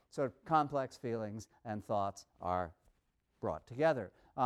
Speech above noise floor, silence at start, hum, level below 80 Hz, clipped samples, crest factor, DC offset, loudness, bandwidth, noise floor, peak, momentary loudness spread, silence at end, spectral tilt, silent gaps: 42 dB; 0.15 s; none; -68 dBFS; under 0.1%; 20 dB; under 0.1%; -38 LUFS; 13 kHz; -78 dBFS; -18 dBFS; 12 LU; 0 s; -6.5 dB/octave; none